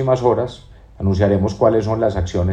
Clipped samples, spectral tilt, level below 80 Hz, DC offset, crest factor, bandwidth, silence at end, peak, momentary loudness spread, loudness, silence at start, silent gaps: under 0.1%; -8 dB/octave; -38 dBFS; under 0.1%; 16 dB; 8.2 kHz; 0 s; -2 dBFS; 6 LU; -18 LUFS; 0 s; none